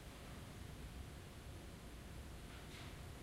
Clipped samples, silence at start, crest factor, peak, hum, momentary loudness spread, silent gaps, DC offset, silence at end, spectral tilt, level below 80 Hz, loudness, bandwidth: under 0.1%; 0 s; 14 dB; -40 dBFS; none; 2 LU; none; under 0.1%; 0 s; -5 dB/octave; -58 dBFS; -54 LUFS; 16 kHz